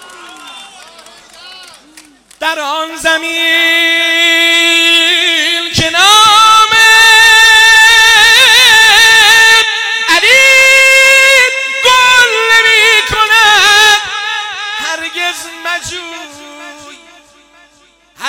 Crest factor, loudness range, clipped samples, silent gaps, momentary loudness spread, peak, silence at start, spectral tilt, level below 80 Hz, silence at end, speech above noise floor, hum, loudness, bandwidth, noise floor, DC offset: 8 dB; 16 LU; under 0.1%; none; 14 LU; 0 dBFS; 0.2 s; 0.5 dB/octave; -42 dBFS; 0 s; 35 dB; none; -5 LUFS; 18.5 kHz; -47 dBFS; under 0.1%